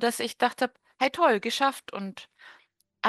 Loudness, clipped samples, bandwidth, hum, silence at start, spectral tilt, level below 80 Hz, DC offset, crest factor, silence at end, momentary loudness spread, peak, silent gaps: -27 LUFS; under 0.1%; 13 kHz; none; 0 s; -3 dB/octave; -76 dBFS; under 0.1%; 20 dB; 0 s; 14 LU; -8 dBFS; none